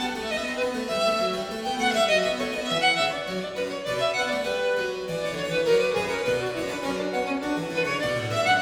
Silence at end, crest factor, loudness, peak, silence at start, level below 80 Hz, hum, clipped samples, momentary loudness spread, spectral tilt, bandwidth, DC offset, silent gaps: 0 s; 16 dB; -25 LUFS; -10 dBFS; 0 s; -56 dBFS; none; under 0.1%; 8 LU; -3.5 dB/octave; 19 kHz; under 0.1%; none